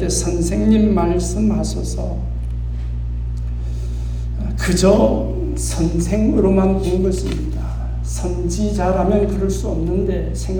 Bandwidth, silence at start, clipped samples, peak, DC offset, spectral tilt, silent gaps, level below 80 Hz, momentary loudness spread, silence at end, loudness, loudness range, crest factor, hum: 18.5 kHz; 0 s; under 0.1%; -2 dBFS; under 0.1%; -6.5 dB/octave; none; -22 dBFS; 11 LU; 0 s; -19 LUFS; 5 LU; 16 dB; 60 Hz at -45 dBFS